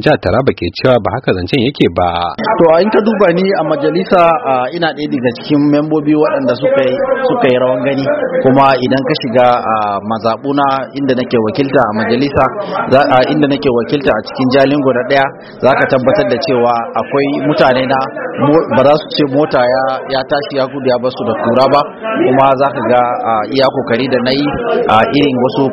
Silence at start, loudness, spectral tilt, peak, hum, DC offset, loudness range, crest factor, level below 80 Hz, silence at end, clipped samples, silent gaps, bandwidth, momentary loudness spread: 0 s; -12 LUFS; -8 dB/octave; 0 dBFS; none; under 0.1%; 1 LU; 12 dB; -44 dBFS; 0 s; 0.2%; none; 6.6 kHz; 6 LU